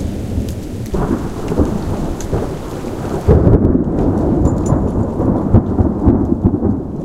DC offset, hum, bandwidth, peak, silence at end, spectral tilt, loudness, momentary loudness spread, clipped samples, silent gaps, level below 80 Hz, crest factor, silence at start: under 0.1%; none; 14.5 kHz; 0 dBFS; 0 s; -9 dB/octave; -16 LUFS; 10 LU; under 0.1%; none; -22 dBFS; 14 dB; 0 s